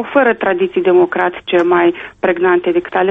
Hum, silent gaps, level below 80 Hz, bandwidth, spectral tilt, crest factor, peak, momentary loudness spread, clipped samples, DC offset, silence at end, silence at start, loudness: none; none; -52 dBFS; 3.8 kHz; -7.5 dB/octave; 14 dB; 0 dBFS; 5 LU; under 0.1%; under 0.1%; 0 s; 0 s; -14 LUFS